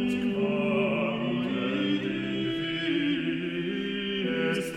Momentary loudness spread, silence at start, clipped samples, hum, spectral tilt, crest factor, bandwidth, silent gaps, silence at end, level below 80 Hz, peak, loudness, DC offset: 4 LU; 0 s; under 0.1%; none; -6 dB/octave; 14 dB; 14 kHz; none; 0 s; -58 dBFS; -14 dBFS; -28 LUFS; under 0.1%